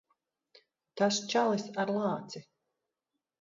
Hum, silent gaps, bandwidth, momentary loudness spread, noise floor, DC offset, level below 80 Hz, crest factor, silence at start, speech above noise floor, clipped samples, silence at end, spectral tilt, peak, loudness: none; none; 7.6 kHz; 18 LU; -88 dBFS; under 0.1%; -82 dBFS; 20 dB; 0.95 s; 57 dB; under 0.1%; 1 s; -4 dB/octave; -14 dBFS; -31 LUFS